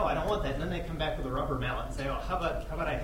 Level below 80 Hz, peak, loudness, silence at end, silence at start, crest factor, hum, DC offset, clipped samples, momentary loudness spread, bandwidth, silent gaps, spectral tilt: -38 dBFS; -16 dBFS; -33 LUFS; 0 s; 0 s; 16 dB; none; under 0.1%; under 0.1%; 4 LU; 16 kHz; none; -6 dB/octave